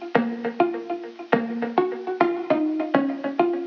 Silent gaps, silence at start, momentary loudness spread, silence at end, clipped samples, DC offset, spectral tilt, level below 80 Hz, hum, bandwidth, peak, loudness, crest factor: none; 0 s; 5 LU; 0 s; under 0.1%; under 0.1%; -7.5 dB/octave; -72 dBFS; none; 6.2 kHz; -2 dBFS; -24 LUFS; 20 dB